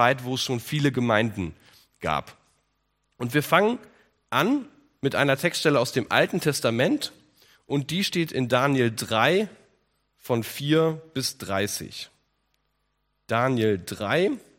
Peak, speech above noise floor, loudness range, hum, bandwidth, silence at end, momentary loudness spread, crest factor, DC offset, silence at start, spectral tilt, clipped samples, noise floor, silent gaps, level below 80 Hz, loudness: -2 dBFS; 50 dB; 5 LU; none; 16.5 kHz; 0.2 s; 10 LU; 24 dB; under 0.1%; 0 s; -5 dB/octave; under 0.1%; -74 dBFS; none; -62 dBFS; -25 LUFS